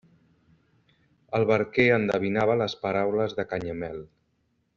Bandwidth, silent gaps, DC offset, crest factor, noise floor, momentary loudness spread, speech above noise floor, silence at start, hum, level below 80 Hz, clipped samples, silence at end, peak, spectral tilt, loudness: 7.4 kHz; none; under 0.1%; 20 dB; -72 dBFS; 12 LU; 47 dB; 1.3 s; none; -60 dBFS; under 0.1%; 0.7 s; -6 dBFS; -4.5 dB/octave; -25 LUFS